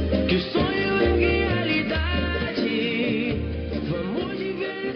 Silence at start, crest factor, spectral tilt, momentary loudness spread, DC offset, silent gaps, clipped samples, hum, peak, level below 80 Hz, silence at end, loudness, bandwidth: 0 s; 16 dB; -4.5 dB/octave; 7 LU; under 0.1%; none; under 0.1%; none; -8 dBFS; -36 dBFS; 0 s; -24 LUFS; 6.2 kHz